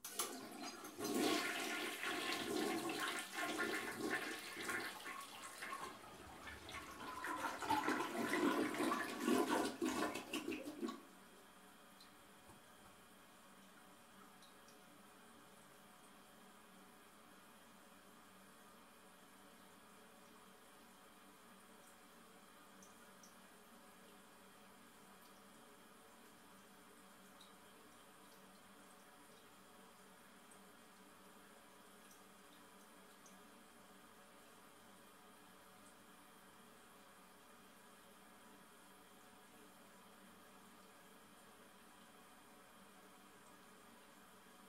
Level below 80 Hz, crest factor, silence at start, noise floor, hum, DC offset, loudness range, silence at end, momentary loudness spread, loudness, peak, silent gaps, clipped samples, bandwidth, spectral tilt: -82 dBFS; 24 dB; 0.05 s; -64 dBFS; none; under 0.1%; 21 LU; 0 s; 22 LU; -43 LUFS; -26 dBFS; none; under 0.1%; 16 kHz; -2.5 dB/octave